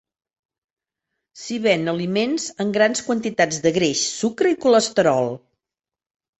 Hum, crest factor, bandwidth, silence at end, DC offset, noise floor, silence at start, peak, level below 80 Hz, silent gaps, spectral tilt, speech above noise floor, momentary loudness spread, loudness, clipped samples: none; 18 dB; 8.4 kHz; 1 s; under 0.1%; -89 dBFS; 1.35 s; -4 dBFS; -62 dBFS; none; -4 dB/octave; 69 dB; 7 LU; -20 LUFS; under 0.1%